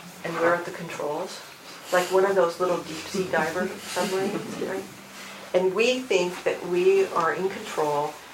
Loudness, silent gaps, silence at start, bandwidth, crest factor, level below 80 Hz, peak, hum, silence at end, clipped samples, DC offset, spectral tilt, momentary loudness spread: -25 LUFS; none; 0 s; 16.5 kHz; 18 dB; -70 dBFS; -8 dBFS; none; 0 s; under 0.1%; under 0.1%; -4 dB/octave; 13 LU